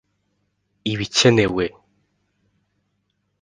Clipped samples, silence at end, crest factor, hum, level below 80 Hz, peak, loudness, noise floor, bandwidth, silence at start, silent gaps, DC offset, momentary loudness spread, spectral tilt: under 0.1%; 1.75 s; 24 dB; 50 Hz at -45 dBFS; -52 dBFS; 0 dBFS; -19 LUFS; -71 dBFS; 10 kHz; 0.85 s; none; under 0.1%; 13 LU; -4.5 dB/octave